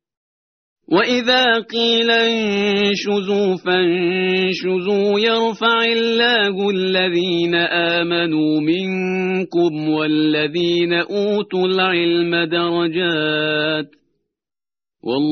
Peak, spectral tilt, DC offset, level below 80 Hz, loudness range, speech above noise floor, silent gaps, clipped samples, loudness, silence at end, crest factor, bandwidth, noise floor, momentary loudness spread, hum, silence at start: -2 dBFS; -2.5 dB/octave; under 0.1%; -60 dBFS; 2 LU; over 73 dB; none; under 0.1%; -17 LUFS; 0 s; 16 dB; 6.6 kHz; under -90 dBFS; 5 LU; none; 0.9 s